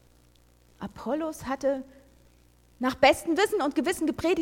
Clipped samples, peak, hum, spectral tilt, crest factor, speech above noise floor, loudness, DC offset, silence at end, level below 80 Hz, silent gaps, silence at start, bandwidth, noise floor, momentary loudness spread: under 0.1%; -6 dBFS; 60 Hz at -60 dBFS; -4 dB/octave; 22 dB; 33 dB; -27 LUFS; under 0.1%; 0 s; -56 dBFS; none; 0.8 s; 17 kHz; -60 dBFS; 14 LU